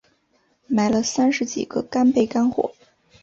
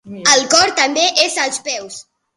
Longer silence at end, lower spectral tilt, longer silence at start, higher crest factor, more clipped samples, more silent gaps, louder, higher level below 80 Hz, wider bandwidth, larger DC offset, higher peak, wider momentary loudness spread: first, 0.5 s vs 0.35 s; first, -4.5 dB/octave vs 0 dB/octave; first, 0.7 s vs 0.05 s; about the same, 16 dB vs 16 dB; neither; neither; second, -21 LUFS vs -13 LUFS; about the same, -58 dBFS vs -58 dBFS; second, 7.8 kHz vs 16 kHz; neither; second, -6 dBFS vs 0 dBFS; second, 8 LU vs 15 LU